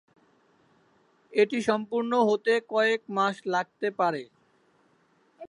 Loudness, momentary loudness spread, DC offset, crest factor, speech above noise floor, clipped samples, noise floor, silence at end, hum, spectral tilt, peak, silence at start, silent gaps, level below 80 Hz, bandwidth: -26 LUFS; 6 LU; under 0.1%; 18 dB; 40 dB; under 0.1%; -66 dBFS; 0.05 s; none; -5 dB/octave; -10 dBFS; 1.3 s; none; -78 dBFS; 11 kHz